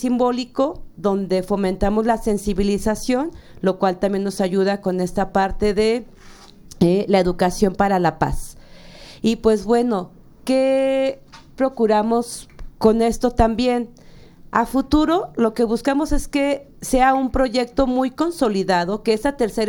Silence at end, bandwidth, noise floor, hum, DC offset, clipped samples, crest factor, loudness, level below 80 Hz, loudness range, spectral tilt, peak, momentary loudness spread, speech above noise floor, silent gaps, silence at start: 0 s; 18 kHz; -43 dBFS; none; under 0.1%; under 0.1%; 18 dB; -20 LUFS; -34 dBFS; 2 LU; -6 dB/octave; -2 dBFS; 7 LU; 24 dB; none; 0 s